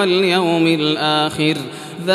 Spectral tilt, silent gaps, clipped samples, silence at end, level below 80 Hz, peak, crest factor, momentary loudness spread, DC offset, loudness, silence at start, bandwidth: -5 dB/octave; none; under 0.1%; 0 s; -60 dBFS; -4 dBFS; 14 dB; 10 LU; under 0.1%; -16 LUFS; 0 s; 14 kHz